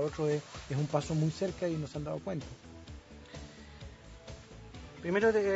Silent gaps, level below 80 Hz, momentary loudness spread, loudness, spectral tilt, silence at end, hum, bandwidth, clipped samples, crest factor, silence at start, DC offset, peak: none; -54 dBFS; 20 LU; -34 LUFS; -6.5 dB/octave; 0 s; none; 8 kHz; under 0.1%; 20 dB; 0 s; under 0.1%; -14 dBFS